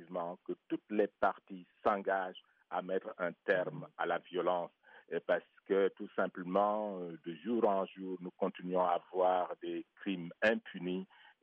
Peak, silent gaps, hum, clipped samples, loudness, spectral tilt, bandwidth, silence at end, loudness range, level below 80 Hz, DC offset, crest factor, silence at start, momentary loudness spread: -18 dBFS; none; none; under 0.1%; -36 LUFS; -4 dB/octave; 5 kHz; 0.35 s; 2 LU; -82 dBFS; under 0.1%; 18 dB; 0 s; 11 LU